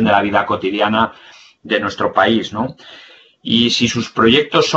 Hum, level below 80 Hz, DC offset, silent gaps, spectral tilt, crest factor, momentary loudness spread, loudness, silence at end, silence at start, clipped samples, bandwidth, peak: none; -50 dBFS; under 0.1%; none; -4.5 dB/octave; 16 dB; 9 LU; -15 LUFS; 0 s; 0 s; under 0.1%; 8 kHz; 0 dBFS